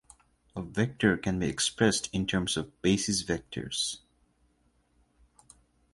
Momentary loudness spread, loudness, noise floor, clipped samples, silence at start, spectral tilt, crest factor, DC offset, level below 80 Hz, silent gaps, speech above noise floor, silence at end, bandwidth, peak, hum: 9 LU; -29 LUFS; -69 dBFS; under 0.1%; 0.55 s; -4 dB/octave; 22 dB; under 0.1%; -54 dBFS; none; 40 dB; 1.95 s; 11.5 kHz; -10 dBFS; none